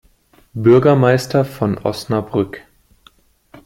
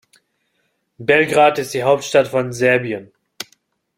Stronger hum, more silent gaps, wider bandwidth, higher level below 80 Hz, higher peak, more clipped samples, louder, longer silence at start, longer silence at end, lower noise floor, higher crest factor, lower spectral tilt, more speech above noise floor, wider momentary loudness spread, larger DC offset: neither; neither; about the same, 16.5 kHz vs 16.5 kHz; first, -50 dBFS vs -60 dBFS; about the same, -2 dBFS vs -2 dBFS; neither; about the same, -16 LUFS vs -16 LUFS; second, 0.55 s vs 1 s; first, 1.05 s vs 0.55 s; second, -53 dBFS vs -68 dBFS; about the same, 16 dB vs 18 dB; first, -7.5 dB/octave vs -4.5 dB/octave; second, 38 dB vs 52 dB; second, 14 LU vs 20 LU; neither